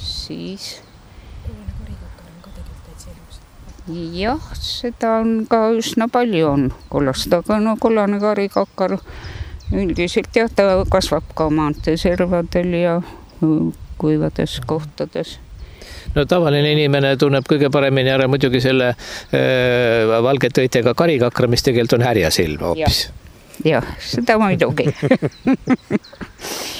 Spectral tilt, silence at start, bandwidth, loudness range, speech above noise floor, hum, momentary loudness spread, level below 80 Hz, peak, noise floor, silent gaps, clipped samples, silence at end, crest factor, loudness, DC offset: -5.5 dB/octave; 0 s; over 20 kHz; 8 LU; 23 dB; none; 17 LU; -36 dBFS; 0 dBFS; -40 dBFS; none; under 0.1%; 0 s; 18 dB; -17 LUFS; under 0.1%